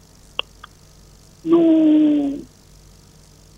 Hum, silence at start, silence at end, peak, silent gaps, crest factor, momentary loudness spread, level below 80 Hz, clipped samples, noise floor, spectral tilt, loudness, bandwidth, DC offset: 50 Hz at -50 dBFS; 1.45 s; 1.15 s; -2 dBFS; none; 18 dB; 16 LU; -52 dBFS; under 0.1%; -47 dBFS; -6 dB/octave; -17 LUFS; 8 kHz; under 0.1%